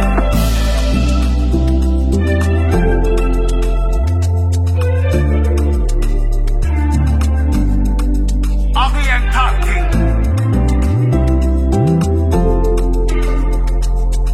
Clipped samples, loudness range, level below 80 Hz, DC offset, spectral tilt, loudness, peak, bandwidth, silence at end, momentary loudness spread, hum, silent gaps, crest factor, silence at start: under 0.1%; 1 LU; -14 dBFS; under 0.1%; -7 dB/octave; -15 LUFS; 0 dBFS; 13.5 kHz; 0 s; 4 LU; none; none; 12 dB; 0 s